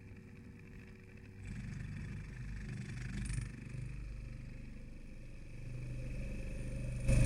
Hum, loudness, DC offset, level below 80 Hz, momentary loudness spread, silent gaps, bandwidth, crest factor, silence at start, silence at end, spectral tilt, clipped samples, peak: none; -46 LUFS; under 0.1%; -44 dBFS; 12 LU; none; 12 kHz; 22 dB; 0 s; 0 s; -6.5 dB/octave; under 0.1%; -18 dBFS